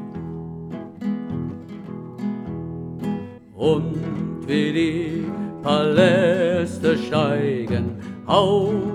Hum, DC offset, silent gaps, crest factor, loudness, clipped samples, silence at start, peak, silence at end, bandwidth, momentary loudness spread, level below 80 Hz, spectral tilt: none; under 0.1%; none; 20 dB; -22 LUFS; under 0.1%; 0 s; -2 dBFS; 0 s; 11.5 kHz; 16 LU; -52 dBFS; -7 dB/octave